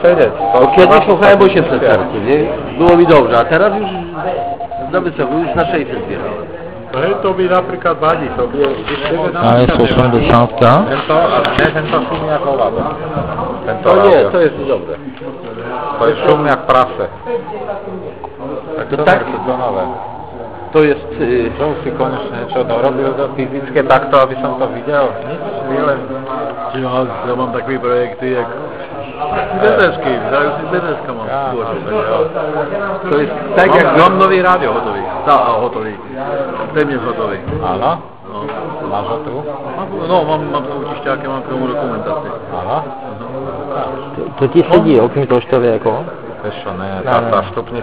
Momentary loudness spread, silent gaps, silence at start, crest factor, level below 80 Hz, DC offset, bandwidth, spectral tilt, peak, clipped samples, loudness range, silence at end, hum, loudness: 14 LU; none; 0 s; 14 dB; -38 dBFS; 1%; 4 kHz; -10.5 dB/octave; 0 dBFS; 0.3%; 7 LU; 0 s; none; -14 LUFS